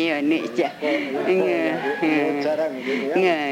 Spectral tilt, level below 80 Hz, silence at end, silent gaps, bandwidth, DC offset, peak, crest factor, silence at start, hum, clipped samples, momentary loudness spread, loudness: -5.5 dB/octave; -72 dBFS; 0 s; none; 16 kHz; under 0.1%; -8 dBFS; 14 dB; 0 s; none; under 0.1%; 4 LU; -22 LUFS